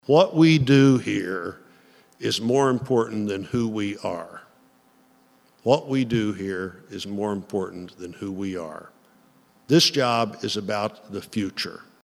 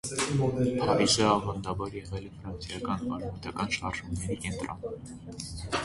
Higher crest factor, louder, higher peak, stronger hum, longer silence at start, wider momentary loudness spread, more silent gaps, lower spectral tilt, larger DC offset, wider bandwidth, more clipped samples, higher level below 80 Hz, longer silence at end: about the same, 20 dB vs 20 dB; first, -23 LUFS vs -30 LUFS; first, -2 dBFS vs -12 dBFS; neither; about the same, 0.1 s vs 0.05 s; about the same, 18 LU vs 16 LU; neither; about the same, -5.5 dB/octave vs -4.5 dB/octave; neither; first, 14.5 kHz vs 11.5 kHz; neither; second, -62 dBFS vs -48 dBFS; first, 0.25 s vs 0 s